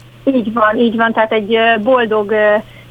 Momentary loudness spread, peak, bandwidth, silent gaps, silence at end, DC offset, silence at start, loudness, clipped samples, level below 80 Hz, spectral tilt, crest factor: 4 LU; 0 dBFS; 5 kHz; none; 0.1 s; under 0.1%; 0.25 s; -13 LUFS; under 0.1%; -50 dBFS; -7 dB/octave; 14 dB